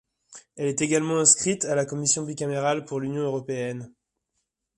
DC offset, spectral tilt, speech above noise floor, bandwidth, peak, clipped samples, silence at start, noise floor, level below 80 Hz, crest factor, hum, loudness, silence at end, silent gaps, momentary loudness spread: under 0.1%; -3.5 dB/octave; 54 dB; 11.5 kHz; -2 dBFS; under 0.1%; 0.3 s; -79 dBFS; -66 dBFS; 24 dB; none; -24 LUFS; 0.9 s; none; 13 LU